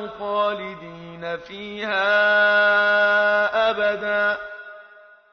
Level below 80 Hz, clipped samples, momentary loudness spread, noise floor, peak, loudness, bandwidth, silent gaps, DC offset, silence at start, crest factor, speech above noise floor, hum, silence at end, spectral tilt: -62 dBFS; under 0.1%; 18 LU; -49 dBFS; -8 dBFS; -19 LUFS; 6.4 kHz; none; under 0.1%; 0 s; 14 dB; 28 dB; none; 0.5 s; -4.5 dB/octave